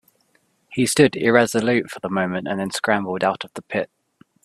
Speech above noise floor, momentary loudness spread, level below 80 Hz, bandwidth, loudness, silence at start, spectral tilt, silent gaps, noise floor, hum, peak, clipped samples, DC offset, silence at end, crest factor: 44 dB; 11 LU; -60 dBFS; 14 kHz; -21 LUFS; 0.7 s; -4.5 dB/octave; none; -64 dBFS; none; 0 dBFS; under 0.1%; under 0.1%; 0.6 s; 22 dB